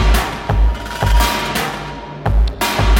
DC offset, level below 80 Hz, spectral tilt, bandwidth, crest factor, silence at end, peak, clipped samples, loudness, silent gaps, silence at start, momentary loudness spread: under 0.1%; -16 dBFS; -4.5 dB/octave; 17 kHz; 14 dB; 0 s; 0 dBFS; under 0.1%; -18 LUFS; none; 0 s; 8 LU